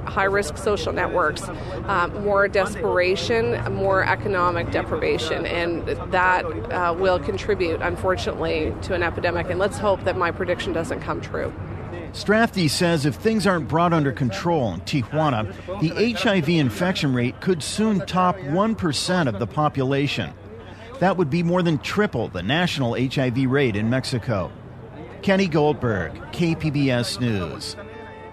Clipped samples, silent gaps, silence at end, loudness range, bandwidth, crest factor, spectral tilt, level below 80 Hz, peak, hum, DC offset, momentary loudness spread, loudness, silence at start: under 0.1%; none; 0 s; 2 LU; 13.5 kHz; 16 dB; -5.5 dB/octave; -42 dBFS; -6 dBFS; none; under 0.1%; 9 LU; -22 LUFS; 0 s